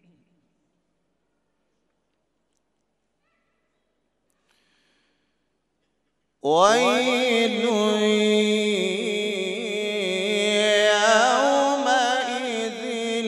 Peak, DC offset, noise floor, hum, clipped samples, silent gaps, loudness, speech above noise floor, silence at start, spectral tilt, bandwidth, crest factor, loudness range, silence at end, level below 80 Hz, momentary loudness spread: -4 dBFS; under 0.1%; -75 dBFS; none; under 0.1%; none; -21 LUFS; 56 dB; 6.45 s; -3 dB/octave; 14 kHz; 20 dB; 4 LU; 0 s; -80 dBFS; 9 LU